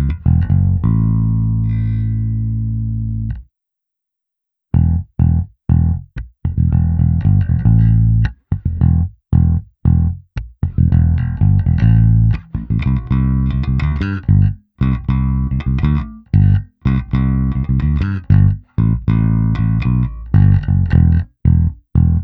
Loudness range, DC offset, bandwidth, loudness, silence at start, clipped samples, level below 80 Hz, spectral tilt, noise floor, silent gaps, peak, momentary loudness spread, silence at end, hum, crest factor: 5 LU; under 0.1%; 4.5 kHz; -16 LUFS; 0 s; under 0.1%; -22 dBFS; -11 dB/octave; -81 dBFS; none; 0 dBFS; 8 LU; 0 s; none; 14 dB